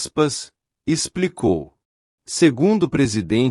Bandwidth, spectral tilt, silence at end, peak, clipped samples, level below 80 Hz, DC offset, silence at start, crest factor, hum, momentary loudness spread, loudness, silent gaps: 12 kHz; -5 dB/octave; 0 s; -4 dBFS; under 0.1%; -50 dBFS; under 0.1%; 0 s; 16 dB; none; 12 LU; -20 LUFS; 1.85-2.18 s